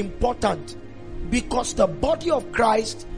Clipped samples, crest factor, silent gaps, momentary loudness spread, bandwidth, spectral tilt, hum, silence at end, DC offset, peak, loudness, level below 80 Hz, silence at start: under 0.1%; 18 dB; none; 17 LU; 10.5 kHz; -4.5 dB/octave; none; 0 s; 0.9%; -6 dBFS; -23 LUFS; -36 dBFS; 0 s